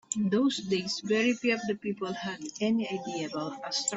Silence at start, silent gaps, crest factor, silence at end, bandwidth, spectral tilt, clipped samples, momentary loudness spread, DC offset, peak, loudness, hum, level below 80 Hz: 0.1 s; none; 18 dB; 0 s; 8.4 kHz; -4 dB/octave; under 0.1%; 8 LU; under 0.1%; -12 dBFS; -30 LUFS; none; -72 dBFS